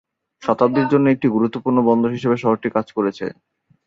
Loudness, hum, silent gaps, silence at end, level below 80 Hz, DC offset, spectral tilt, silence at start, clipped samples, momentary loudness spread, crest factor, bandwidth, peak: -18 LUFS; none; none; 0.55 s; -60 dBFS; under 0.1%; -8.5 dB/octave; 0.4 s; under 0.1%; 7 LU; 16 dB; 7.4 kHz; -2 dBFS